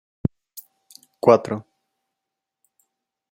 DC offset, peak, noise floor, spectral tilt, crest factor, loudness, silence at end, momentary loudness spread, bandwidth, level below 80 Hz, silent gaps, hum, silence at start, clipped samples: under 0.1%; -2 dBFS; -84 dBFS; -7.5 dB/octave; 24 dB; -21 LUFS; 1.7 s; 25 LU; 16.5 kHz; -54 dBFS; none; none; 0.25 s; under 0.1%